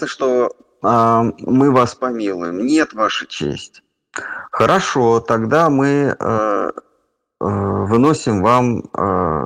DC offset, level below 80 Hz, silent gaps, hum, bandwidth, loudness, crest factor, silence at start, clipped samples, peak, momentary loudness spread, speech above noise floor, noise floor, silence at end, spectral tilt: under 0.1%; -48 dBFS; none; none; 11 kHz; -16 LUFS; 16 dB; 0 s; under 0.1%; 0 dBFS; 11 LU; 49 dB; -65 dBFS; 0 s; -6 dB/octave